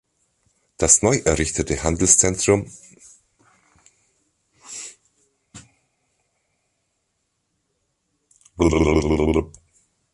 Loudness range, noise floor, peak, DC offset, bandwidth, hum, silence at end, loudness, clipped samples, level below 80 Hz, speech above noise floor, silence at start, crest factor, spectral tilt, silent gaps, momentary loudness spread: 24 LU; -73 dBFS; 0 dBFS; under 0.1%; 11.5 kHz; none; 0.65 s; -18 LUFS; under 0.1%; -36 dBFS; 55 dB; 0.8 s; 24 dB; -4 dB/octave; none; 21 LU